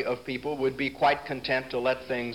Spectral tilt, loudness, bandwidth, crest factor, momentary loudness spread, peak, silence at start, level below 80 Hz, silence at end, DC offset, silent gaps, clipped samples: -5.5 dB/octave; -28 LUFS; 16.5 kHz; 18 dB; 6 LU; -10 dBFS; 0 s; -58 dBFS; 0 s; 0.1%; none; under 0.1%